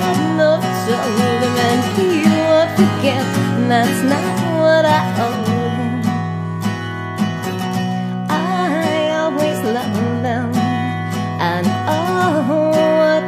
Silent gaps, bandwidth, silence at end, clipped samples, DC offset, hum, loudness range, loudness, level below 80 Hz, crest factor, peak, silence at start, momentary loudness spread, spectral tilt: none; 15.5 kHz; 0 s; under 0.1%; under 0.1%; none; 5 LU; -17 LUFS; -56 dBFS; 16 dB; 0 dBFS; 0 s; 8 LU; -6 dB/octave